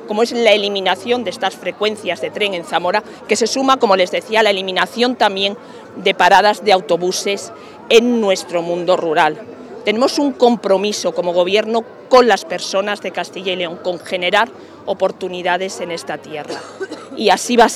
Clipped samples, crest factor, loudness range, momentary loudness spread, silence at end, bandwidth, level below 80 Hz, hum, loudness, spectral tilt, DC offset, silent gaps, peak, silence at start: under 0.1%; 16 dB; 5 LU; 13 LU; 0 s; 16 kHz; -60 dBFS; none; -16 LUFS; -3 dB/octave; under 0.1%; none; 0 dBFS; 0 s